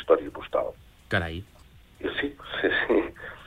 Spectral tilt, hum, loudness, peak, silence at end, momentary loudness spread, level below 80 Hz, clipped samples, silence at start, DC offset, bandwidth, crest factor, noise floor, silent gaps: -6.5 dB/octave; none; -28 LUFS; -6 dBFS; 0 s; 12 LU; -50 dBFS; under 0.1%; 0 s; under 0.1%; 14.5 kHz; 22 dB; -50 dBFS; none